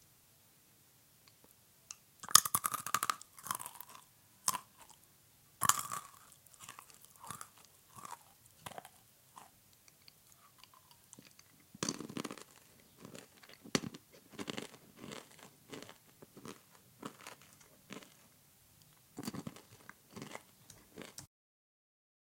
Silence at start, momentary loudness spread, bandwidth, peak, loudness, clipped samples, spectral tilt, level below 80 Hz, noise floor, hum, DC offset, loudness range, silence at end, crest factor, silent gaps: 1.9 s; 24 LU; 17 kHz; 0 dBFS; -37 LUFS; under 0.1%; -1 dB/octave; -78 dBFS; -66 dBFS; none; under 0.1%; 20 LU; 1.05 s; 44 dB; none